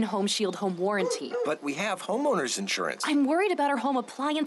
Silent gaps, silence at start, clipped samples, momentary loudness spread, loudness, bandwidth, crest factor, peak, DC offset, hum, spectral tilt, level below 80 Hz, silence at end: none; 0 s; under 0.1%; 5 LU; -28 LUFS; 11.5 kHz; 10 dB; -16 dBFS; under 0.1%; none; -3.5 dB/octave; -82 dBFS; 0 s